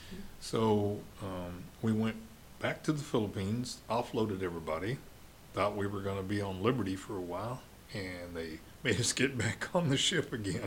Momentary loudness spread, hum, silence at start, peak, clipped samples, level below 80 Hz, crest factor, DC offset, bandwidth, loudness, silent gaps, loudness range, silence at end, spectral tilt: 12 LU; none; 0 s; -14 dBFS; under 0.1%; -58 dBFS; 20 dB; under 0.1%; 17 kHz; -35 LUFS; none; 3 LU; 0 s; -4.5 dB/octave